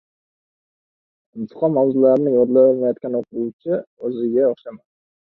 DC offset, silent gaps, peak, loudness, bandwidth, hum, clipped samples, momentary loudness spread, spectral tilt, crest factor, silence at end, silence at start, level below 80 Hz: under 0.1%; 3.53-3.59 s, 3.87-3.97 s; -4 dBFS; -18 LUFS; 4.1 kHz; none; under 0.1%; 15 LU; -11.5 dB/octave; 16 dB; 0.65 s; 1.35 s; -66 dBFS